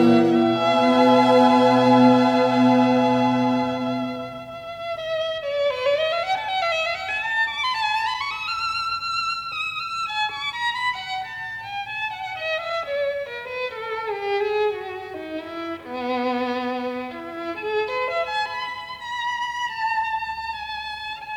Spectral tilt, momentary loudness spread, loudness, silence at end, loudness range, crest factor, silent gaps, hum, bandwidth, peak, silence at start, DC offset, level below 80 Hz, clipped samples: -5.5 dB/octave; 15 LU; -22 LUFS; 0 s; 10 LU; 18 dB; none; none; 10.5 kHz; -4 dBFS; 0 s; under 0.1%; -60 dBFS; under 0.1%